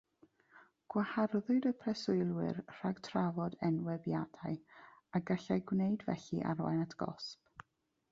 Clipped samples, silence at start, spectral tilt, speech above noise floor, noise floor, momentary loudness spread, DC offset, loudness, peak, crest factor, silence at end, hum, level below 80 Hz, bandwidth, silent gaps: under 0.1%; 0.55 s; -7 dB/octave; 43 dB; -79 dBFS; 10 LU; under 0.1%; -37 LUFS; -20 dBFS; 16 dB; 0.8 s; none; -72 dBFS; 7.6 kHz; none